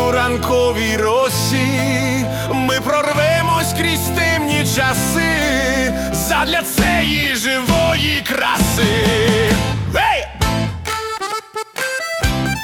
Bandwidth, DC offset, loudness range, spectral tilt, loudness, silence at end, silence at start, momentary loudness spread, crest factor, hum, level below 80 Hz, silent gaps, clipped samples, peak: 18 kHz; under 0.1%; 2 LU; -4 dB/octave; -16 LUFS; 0 s; 0 s; 6 LU; 14 dB; none; -32 dBFS; none; under 0.1%; -2 dBFS